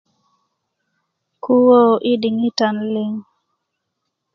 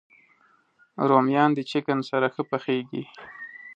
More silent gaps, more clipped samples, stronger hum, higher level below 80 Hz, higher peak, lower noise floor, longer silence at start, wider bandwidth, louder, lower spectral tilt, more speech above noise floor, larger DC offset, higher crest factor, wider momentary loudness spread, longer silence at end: neither; neither; neither; first, -70 dBFS vs -76 dBFS; about the same, -2 dBFS vs -4 dBFS; first, -76 dBFS vs -62 dBFS; first, 1.45 s vs 1 s; second, 7.2 kHz vs 8.4 kHz; first, -16 LUFS vs -24 LUFS; about the same, -6 dB/octave vs -7 dB/octave; first, 61 dB vs 38 dB; neither; about the same, 18 dB vs 22 dB; second, 15 LU vs 20 LU; first, 1.15 s vs 0.05 s